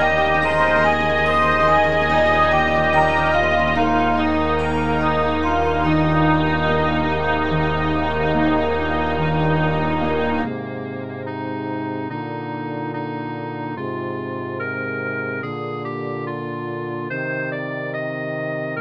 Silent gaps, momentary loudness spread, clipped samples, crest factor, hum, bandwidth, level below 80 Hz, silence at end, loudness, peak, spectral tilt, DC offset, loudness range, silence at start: none; 11 LU; under 0.1%; 16 dB; none; 9.4 kHz; -36 dBFS; 0 s; -20 LUFS; -4 dBFS; -7 dB/octave; under 0.1%; 10 LU; 0 s